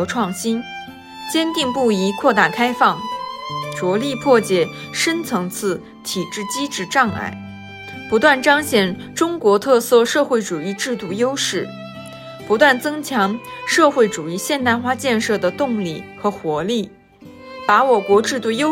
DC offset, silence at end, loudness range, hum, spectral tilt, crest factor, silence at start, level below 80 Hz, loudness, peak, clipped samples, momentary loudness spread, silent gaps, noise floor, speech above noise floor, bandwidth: under 0.1%; 0 s; 4 LU; none; -4 dB/octave; 18 dB; 0 s; -58 dBFS; -18 LUFS; 0 dBFS; under 0.1%; 13 LU; none; -42 dBFS; 24 dB; 16.5 kHz